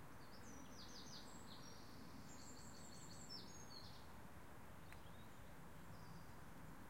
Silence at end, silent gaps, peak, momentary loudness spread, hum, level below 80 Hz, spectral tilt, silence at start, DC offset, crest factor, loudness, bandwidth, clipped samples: 0 s; none; -42 dBFS; 6 LU; none; -70 dBFS; -3.5 dB/octave; 0 s; 0.1%; 18 dB; -59 LUFS; 16.5 kHz; under 0.1%